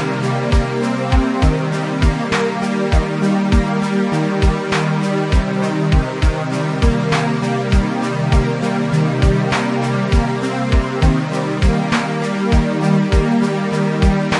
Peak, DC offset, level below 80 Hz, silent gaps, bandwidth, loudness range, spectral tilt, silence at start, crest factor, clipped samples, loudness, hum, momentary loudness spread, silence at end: -2 dBFS; under 0.1%; -22 dBFS; none; 11.5 kHz; 1 LU; -6.5 dB/octave; 0 s; 14 dB; under 0.1%; -17 LUFS; none; 4 LU; 0 s